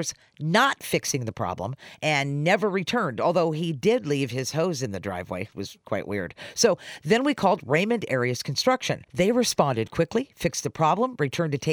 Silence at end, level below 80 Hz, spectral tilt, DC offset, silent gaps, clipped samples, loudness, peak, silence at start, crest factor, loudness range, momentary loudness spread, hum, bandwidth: 0 s; -58 dBFS; -4.5 dB/octave; under 0.1%; none; under 0.1%; -25 LUFS; -6 dBFS; 0 s; 20 dB; 3 LU; 10 LU; none; over 20 kHz